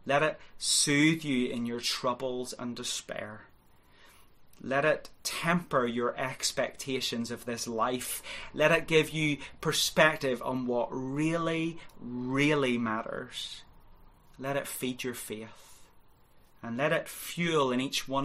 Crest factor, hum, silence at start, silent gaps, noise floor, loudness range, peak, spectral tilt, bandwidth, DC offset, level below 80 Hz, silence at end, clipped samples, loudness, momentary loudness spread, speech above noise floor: 24 dB; none; 0 s; none; -59 dBFS; 8 LU; -8 dBFS; -3.5 dB/octave; 16 kHz; under 0.1%; -60 dBFS; 0 s; under 0.1%; -30 LUFS; 14 LU; 29 dB